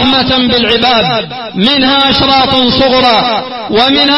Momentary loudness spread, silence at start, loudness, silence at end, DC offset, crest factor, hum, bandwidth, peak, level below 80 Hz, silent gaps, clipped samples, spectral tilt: 7 LU; 0 s; -8 LUFS; 0 s; under 0.1%; 10 dB; none; 11 kHz; 0 dBFS; -34 dBFS; none; 0.2%; -6 dB/octave